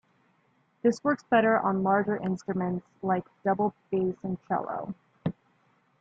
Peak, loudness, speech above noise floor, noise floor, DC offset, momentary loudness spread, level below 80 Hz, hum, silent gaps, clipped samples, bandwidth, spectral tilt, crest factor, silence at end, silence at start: -12 dBFS; -28 LUFS; 41 dB; -68 dBFS; under 0.1%; 12 LU; -68 dBFS; none; none; under 0.1%; 7.8 kHz; -7.5 dB/octave; 18 dB; 0.7 s; 0.85 s